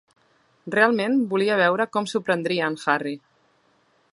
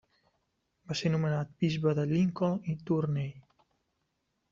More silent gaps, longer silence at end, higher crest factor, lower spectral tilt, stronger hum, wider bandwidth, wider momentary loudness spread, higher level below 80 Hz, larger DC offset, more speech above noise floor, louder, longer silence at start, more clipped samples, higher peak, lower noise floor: neither; second, 0.95 s vs 1.1 s; about the same, 20 dB vs 18 dB; second, -5 dB/octave vs -7 dB/octave; neither; first, 11.5 kHz vs 7.4 kHz; about the same, 9 LU vs 7 LU; second, -74 dBFS vs -66 dBFS; neither; second, 41 dB vs 50 dB; first, -22 LUFS vs -31 LUFS; second, 0.65 s vs 0.9 s; neither; first, -4 dBFS vs -16 dBFS; second, -63 dBFS vs -80 dBFS